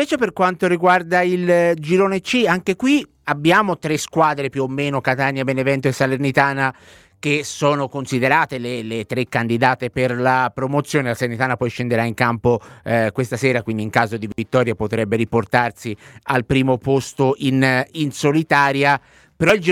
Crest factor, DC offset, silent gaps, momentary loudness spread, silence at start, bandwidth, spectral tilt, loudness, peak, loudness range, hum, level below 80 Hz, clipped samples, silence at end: 18 dB; under 0.1%; none; 7 LU; 0 s; 16.5 kHz; -5.5 dB/octave; -18 LUFS; 0 dBFS; 3 LU; none; -52 dBFS; under 0.1%; 0 s